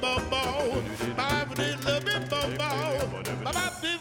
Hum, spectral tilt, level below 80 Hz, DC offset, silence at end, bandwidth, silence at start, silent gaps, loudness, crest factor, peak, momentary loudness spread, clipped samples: none; -4 dB/octave; -46 dBFS; under 0.1%; 0 s; 17 kHz; 0 s; none; -29 LUFS; 16 dB; -14 dBFS; 4 LU; under 0.1%